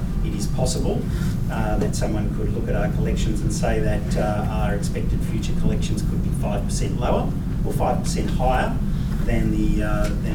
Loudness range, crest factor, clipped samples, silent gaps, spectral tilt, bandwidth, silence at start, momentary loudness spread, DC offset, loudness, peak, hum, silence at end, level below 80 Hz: 1 LU; 14 dB; under 0.1%; none; -6.5 dB/octave; 18 kHz; 0 s; 3 LU; under 0.1%; -23 LUFS; -8 dBFS; none; 0 s; -26 dBFS